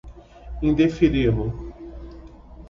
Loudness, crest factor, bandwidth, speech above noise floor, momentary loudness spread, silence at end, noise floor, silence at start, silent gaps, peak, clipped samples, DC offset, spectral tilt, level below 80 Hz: -21 LUFS; 18 dB; 7.4 kHz; 23 dB; 22 LU; 0 s; -42 dBFS; 0.05 s; none; -6 dBFS; under 0.1%; under 0.1%; -8.5 dB/octave; -36 dBFS